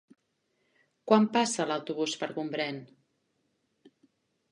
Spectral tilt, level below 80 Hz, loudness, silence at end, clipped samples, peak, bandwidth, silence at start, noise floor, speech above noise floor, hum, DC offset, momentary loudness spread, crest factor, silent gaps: -4 dB/octave; -82 dBFS; -29 LUFS; 1.65 s; under 0.1%; -8 dBFS; 11 kHz; 1.05 s; -76 dBFS; 48 dB; none; under 0.1%; 11 LU; 24 dB; none